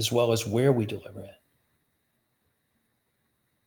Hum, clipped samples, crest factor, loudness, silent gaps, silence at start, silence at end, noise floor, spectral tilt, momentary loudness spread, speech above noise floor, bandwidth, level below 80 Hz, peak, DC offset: none; under 0.1%; 20 dB; -25 LUFS; none; 0 s; 2.35 s; -75 dBFS; -5.5 dB/octave; 20 LU; 49 dB; over 20 kHz; -68 dBFS; -10 dBFS; under 0.1%